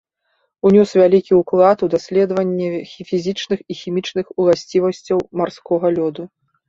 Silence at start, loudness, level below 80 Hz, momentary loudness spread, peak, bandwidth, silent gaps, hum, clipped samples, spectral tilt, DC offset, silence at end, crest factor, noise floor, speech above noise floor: 0.65 s; -17 LUFS; -58 dBFS; 11 LU; -2 dBFS; 7.6 kHz; none; none; under 0.1%; -7 dB/octave; under 0.1%; 0.4 s; 16 dB; -68 dBFS; 51 dB